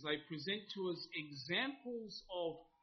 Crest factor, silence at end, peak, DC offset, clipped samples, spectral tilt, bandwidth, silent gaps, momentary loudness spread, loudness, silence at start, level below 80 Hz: 20 dB; 0.2 s; -24 dBFS; under 0.1%; under 0.1%; -2 dB/octave; 6.2 kHz; none; 8 LU; -43 LUFS; 0 s; -78 dBFS